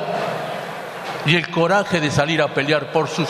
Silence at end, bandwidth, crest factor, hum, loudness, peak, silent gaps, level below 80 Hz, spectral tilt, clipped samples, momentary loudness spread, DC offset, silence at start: 0 s; 13.5 kHz; 18 dB; none; -20 LUFS; -2 dBFS; none; -54 dBFS; -5 dB/octave; under 0.1%; 11 LU; under 0.1%; 0 s